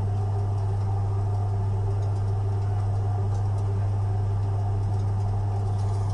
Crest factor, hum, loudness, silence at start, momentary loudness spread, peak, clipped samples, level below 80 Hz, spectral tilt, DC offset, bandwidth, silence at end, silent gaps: 8 dB; none; -26 LUFS; 0 s; 0 LU; -16 dBFS; under 0.1%; -38 dBFS; -8.5 dB/octave; under 0.1%; 6.6 kHz; 0 s; none